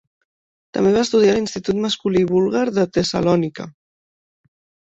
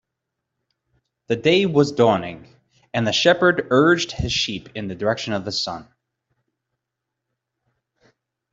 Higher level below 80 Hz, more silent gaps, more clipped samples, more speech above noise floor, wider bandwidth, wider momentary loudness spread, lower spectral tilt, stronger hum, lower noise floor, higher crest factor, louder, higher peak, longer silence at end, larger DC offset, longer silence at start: about the same, -52 dBFS vs -50 dBFS; neither; neither; first, over 72 dB vs 63 dB; about the same, 8 kHz vs 7.8 kHz; about the same, 11 LU vs 12 LU; about the same, -5.5 dB/octave vs -4.5 dB/octave; neither; first, under -90 dBFS vs -82 dBFS; about the same, 16 dB vs 20 dB; about the same, -18 LUFS vs -19 LUFS; about the same, -4 dBFS vs -4 dBFS; second, 1.2 s vs 2.7 s; neither; second, 0.75 s vs 1.3 s